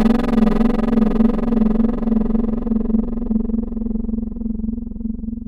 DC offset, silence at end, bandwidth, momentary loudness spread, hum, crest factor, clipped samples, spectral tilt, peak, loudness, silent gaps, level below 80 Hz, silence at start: under 0.1%; 0.05 s; 5.2 kHz; 9 LU; none; 12 dB; under 0.1%; -9 dB/octave; -6 dBFS; -20 LUFS; none; -24 dBFS; 0 s